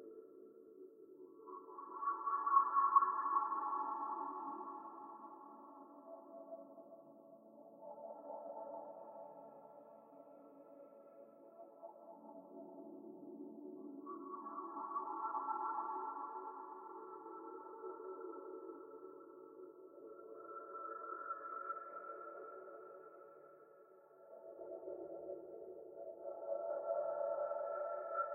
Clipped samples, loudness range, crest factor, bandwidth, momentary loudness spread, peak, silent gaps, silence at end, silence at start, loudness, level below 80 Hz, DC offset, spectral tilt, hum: under 0.1%; 19 LU; 28 dB; 2.3 kHz; 20 LU; -18 dBFS; none; 0 s; 0 s; -43 LUFS; under -90 dBFS; under 0.1%; -8 dB/octave; none